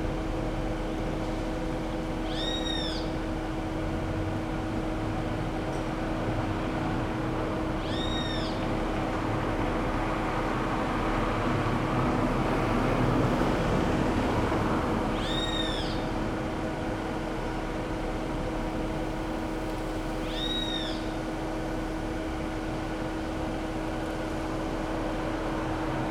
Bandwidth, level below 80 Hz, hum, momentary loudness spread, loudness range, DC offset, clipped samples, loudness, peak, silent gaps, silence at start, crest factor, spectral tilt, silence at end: 14.5 kHz; -38 dBFS; none; 6 LU; 5 LU; under 0.1%; under 0.1%; -30 LUFS; -14 dBFS; none; 0 s; 16 dB; -6 dB/octave; 0 s